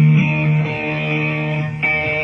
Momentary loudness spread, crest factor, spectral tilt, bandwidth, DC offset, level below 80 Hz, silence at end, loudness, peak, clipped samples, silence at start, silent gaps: 6 LU; 12 dB; -8.5 dB/octave; 6 kHz; under 0.1%; -48 dBFS; 0 s; -17 LUFS; -4 dBFS; under 0.1%; 0 s; none